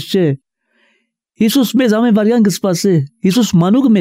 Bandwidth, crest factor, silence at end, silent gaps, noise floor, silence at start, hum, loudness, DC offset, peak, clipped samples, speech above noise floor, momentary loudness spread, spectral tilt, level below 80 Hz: 16 kHz; 10 dB; 0 s; none; -62 dBFS; 0 s; none; -13 LUFS; under 0.1%; -2 dBFS; under 0.1%; 50 dB; 4 LU; -6 dB/octave; -54 dBFS